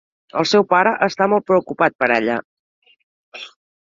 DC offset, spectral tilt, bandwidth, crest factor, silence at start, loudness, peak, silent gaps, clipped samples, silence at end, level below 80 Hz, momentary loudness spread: under 0.1%; -5 dB/octave; 7.6 kHz; 18 dB; 0.35 s; -17 LUFS; -2 dBFS; 1.95-1.99 s, 2.45-2.82 s, 3.03-3.32 s; under 0.1%; 0.4 s; -64 dBFS; 20 LU